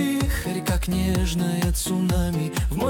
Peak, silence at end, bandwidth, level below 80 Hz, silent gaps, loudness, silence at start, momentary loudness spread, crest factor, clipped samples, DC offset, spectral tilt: -10 dBFS; 0 s; 19 kHz; -28 dBFS; none; -24 LUFS; 0 s; 3 LU; 12 dB; under 0.1%; under 0.1%; -5.5 dB/octave